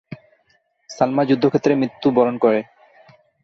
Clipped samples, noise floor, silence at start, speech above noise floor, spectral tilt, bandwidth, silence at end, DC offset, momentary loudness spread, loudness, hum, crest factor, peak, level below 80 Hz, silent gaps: under 0.1%; -63 dBFS; 0.1 s; 46 dB; -7 dB/octave; 7.4 kHz; 0.8 s; under 0.1%; 23 LU; -18 LUFS; none; 18 dB; -2 dBFS; -62 dBFS; none